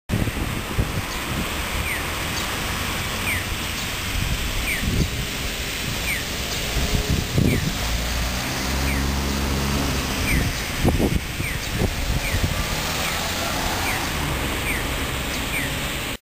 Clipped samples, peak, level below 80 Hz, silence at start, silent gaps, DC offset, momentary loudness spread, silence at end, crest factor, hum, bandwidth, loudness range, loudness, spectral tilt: under 0.1%; -6 dBFS; -30 dBFS; 0.1 s; none; 0.4%; 4 LU; 0.05 s; 18 dB; none; 16 kHz; 2 LU; -23 LUFS; -3.5 dB/octave